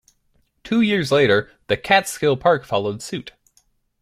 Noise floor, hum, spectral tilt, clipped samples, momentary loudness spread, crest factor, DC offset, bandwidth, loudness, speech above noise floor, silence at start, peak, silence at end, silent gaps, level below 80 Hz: -64 dBFS; none; -5 dB/octave; under 0.1%; 11 LU; 18 dB; under 0.1%; 15 kHz; -19 LUFS; 45 dB; 0.65 s; -2 dBFS; 0.7 s; none; -54 dBFS